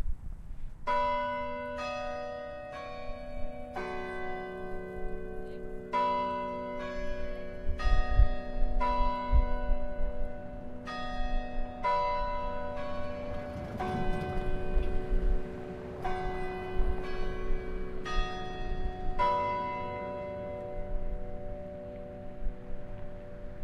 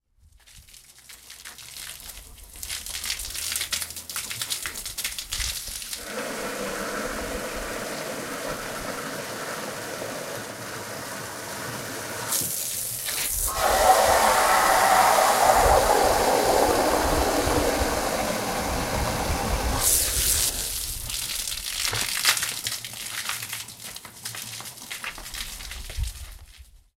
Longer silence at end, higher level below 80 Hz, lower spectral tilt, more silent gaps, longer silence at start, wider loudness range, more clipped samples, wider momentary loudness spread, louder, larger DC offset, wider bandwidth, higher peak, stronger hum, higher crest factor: second, 0 s vs 0.2 s; first, -34 dBFS vs -40 dBFS; first, -7 dB/octave vs -2 dB/octave; neither; second, 0 s vs 0.5 s; second, 6 LU vs 13 LU; neither; second, 13 LU vs 16 LU; second, -36 LUFS vs -24 LUFS; neither; second, 6.2 kHz vs 17 kHz; second, -10 dBFS vs -2 dBFS; neither; about the same, 20 dB vs 24 dB